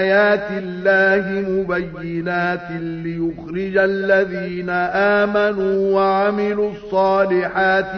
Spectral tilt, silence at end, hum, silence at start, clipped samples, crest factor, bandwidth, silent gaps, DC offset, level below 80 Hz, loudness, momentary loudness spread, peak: -7.5 dB/octave; 0 s; none; 0 s; under 0.1%; 14 dB; 6.4 kHz; none; under 0.1%; -50 dBFS; -18 LUFS; 10 LU; -4 dBFS